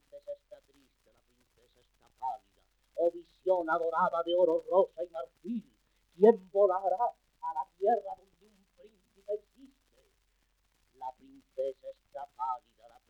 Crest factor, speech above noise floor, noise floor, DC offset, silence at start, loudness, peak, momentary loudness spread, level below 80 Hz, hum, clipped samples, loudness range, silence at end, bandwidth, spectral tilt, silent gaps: 24 dB; 45 dB; -74 dBFS; under 0.1%; 0.15 s; -31 LUFS; -10 dBFS; 19 LU; -74 dBFS; none; under 0.1%; 15 LU; 0.5 s; 8.2 kHz; -7 dB/octave; none